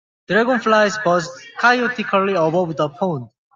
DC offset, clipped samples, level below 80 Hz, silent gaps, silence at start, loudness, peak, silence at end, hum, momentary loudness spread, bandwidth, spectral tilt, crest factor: under 0.1%; under 0.1%; -64 dBFS; none; 0.3 s; -18 LUFS; -2 dBFS; 0.3 s; none; 8 LU; 7.6 kHz; -5 dB/octave; 16 dB